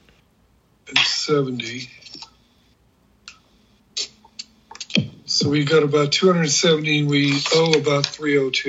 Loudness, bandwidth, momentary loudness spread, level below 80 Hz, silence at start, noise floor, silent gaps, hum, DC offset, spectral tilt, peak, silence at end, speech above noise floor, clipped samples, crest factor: -19 LUFS; 8 kHz; 21 LU; -64 dBFS; 0.85 s; -59 dBFS; none; none; under 0.1%; -4 dB/octave; 0 dBFS; 0 s; 41 dB; under 0.1%; 20 dB